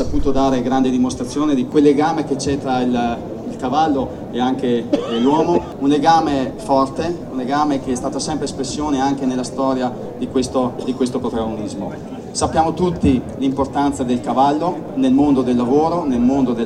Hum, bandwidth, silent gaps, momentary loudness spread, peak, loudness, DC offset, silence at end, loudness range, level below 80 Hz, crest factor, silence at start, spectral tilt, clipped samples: none; 11.5 kHz; none; 8 LU; -2 dBFS; -18 LUFS; under 0.1%; 0 s; 3 LU; -38 dBFS; 16 dB; 0 s; -6 dB/octave; under 0.1%